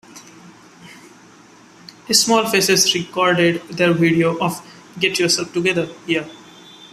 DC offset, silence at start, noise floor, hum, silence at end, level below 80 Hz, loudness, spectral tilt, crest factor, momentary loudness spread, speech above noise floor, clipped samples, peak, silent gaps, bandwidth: under 0.1%; 0.15 s; -46 dBFS; none; 0.05 s; -60 dBFS; -17 LUFS; -3 dB/octave; 18 dB; 9 LU; 29 dB; under 0.1%; 0 dBFS; none; 15 kHz